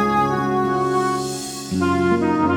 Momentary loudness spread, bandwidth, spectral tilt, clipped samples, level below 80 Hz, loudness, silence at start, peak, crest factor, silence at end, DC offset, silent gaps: 7 LU; 17.5 kHz; -5.5 dB/octave; under 0.1%; -48 dBFS; -20 LUFS; 0 s; -6 dBFS; 12 dB; 0 s; under 0.1%; none